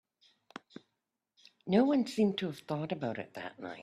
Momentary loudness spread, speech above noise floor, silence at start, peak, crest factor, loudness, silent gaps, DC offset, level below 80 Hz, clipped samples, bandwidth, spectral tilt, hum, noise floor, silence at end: 22 LU; 53 dB; 1.65 s; -14 dBFS; 20 dB; -33 LUFS; none; under 0.1%; -76 dBFS; under 0.1%; 13.5 kHz; -6.5 dB/octave; none; -86 dBFS; 0 s